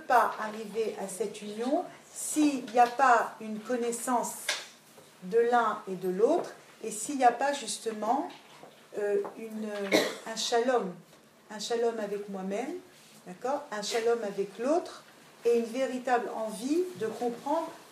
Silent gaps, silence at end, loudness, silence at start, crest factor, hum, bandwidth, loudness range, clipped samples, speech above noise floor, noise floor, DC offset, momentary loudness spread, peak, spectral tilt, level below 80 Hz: none; 0 s; -30 LUFS; 0 s; 22 dB; none; 15.5 kHz; 5 LU; under 0.1%; 26 dB; -55 dBFS; under 0.1%; 13 LU; -10 dBFS; -3.5 dB/octave; -88 dBFS